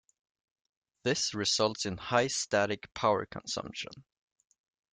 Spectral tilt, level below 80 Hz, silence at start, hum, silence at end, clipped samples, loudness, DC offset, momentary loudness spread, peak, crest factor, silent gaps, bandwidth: -3 dB/octave; -66 dBFS; 1.05 s; none; 0.9 s; under 0.1%; -31 LUFS; under 0.1%; 9 LU; -12 dBFS; 22 dB; none; 11 kHz